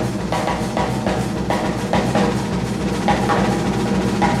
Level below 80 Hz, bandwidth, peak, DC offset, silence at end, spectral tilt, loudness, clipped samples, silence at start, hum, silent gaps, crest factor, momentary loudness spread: -34 dBFS; 15 kHz; -4 dBFS; under 0.1%; 0 s; -6 dB/octave; -20 LUFS; under 0.1%; 0 s; none; none; 16 dB; 4 LU